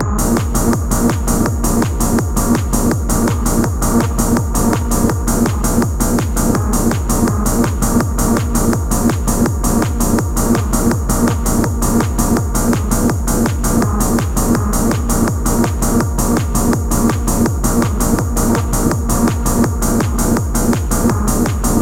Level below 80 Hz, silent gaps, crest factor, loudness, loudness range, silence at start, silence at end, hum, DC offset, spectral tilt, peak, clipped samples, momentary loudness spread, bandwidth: -20 dBFS; none; 14 dB; -15 LUFS; 0 LU; 0 s; 0 s; none; 0.3%; -5.5 dB/octave; 0 dBFS; under 0.1%; 1 LU; 17 kHz